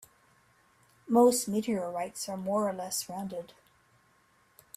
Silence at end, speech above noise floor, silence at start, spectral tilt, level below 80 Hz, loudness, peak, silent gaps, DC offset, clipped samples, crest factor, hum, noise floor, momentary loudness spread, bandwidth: 1.3 s; 37 dB; 1.05 s; -4.5 dB/octave; -72 dBFS; -30 LUFS; -12 dBFS; none; under 0.1%; under 0.1%; 20 dB; none; -67 dBFS; 15 LU; 16 kHz